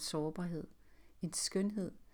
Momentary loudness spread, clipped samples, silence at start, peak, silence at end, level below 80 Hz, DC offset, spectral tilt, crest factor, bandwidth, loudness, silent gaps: 11 LU; under 0.1%; 0 s; -24 dBFS; 0.1 s; -66 dBFS; under 0.1%; -4.5 dB/octave; 16 dB; 19.5 kHz; -39 LUFS; none